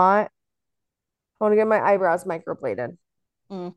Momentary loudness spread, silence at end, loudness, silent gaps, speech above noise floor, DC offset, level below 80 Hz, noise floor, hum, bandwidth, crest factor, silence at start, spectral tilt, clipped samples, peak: 15 LU; 0.05 s; -22 LUFS; none; 64 dB; under 0.1%; -72 dBFS; -86 dBFS; none; 12 kHz; 18 dB; 0 s; -7 dB/octave; under 0.1%; -6 dBFS